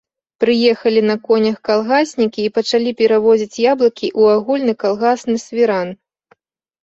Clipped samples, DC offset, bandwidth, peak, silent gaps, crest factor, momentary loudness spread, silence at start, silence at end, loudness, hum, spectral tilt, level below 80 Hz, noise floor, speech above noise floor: under 0.1%; under 0.1%; 8 kHz; -2 dBFS; none; 14 dB; 5 LU; 0.4 s; 0.9 s; -15 LUFS; none; -5 dB/octave; -60 dBFS; -57 dBFS; 42 dB